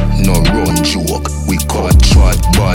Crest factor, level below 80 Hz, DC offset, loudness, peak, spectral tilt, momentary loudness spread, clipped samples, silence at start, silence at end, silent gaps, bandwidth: 10 dB; -14 dBFS; under 0.1%; -12 LUFS; 0 dBFS; -5 dB/octave; 8 LU; under 0.1%; 0 s; 0 s; none; 17 kHz